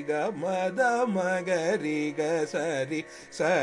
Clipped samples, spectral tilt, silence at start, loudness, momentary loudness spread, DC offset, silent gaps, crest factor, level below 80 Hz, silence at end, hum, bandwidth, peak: under 0.1%; -5 dB/octave; 0 s; -28 LUFS; 5 LU; under 0.1%; none; 14 dB; -74 dBFS; 0 s; none; 11.5 kHz; -14 dBFS